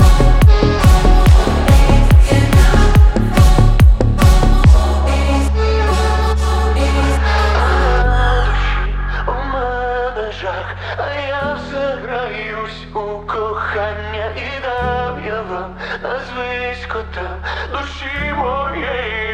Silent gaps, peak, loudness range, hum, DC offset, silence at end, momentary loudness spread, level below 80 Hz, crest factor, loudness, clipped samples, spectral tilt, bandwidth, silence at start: none; 0 dBFS; 11 LU; none; under 0.1%; 0 s; 12 LU; -16 dBFS; 12 dB; -15 LUFS; under 0.1%; -6 dB/octave; 15.5 kHz; 0 s